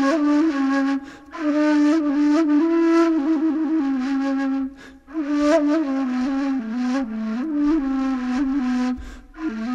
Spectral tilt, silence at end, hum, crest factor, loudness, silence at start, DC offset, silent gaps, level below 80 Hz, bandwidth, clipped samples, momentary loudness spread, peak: -5.5 dB/octave; 0 s; none; 14 dB; -21 LUFS; 0 s; under 0.1%; none; -48 dBFS; 7.8 kHz; under 0.1%; 10 LU; -6 dBFS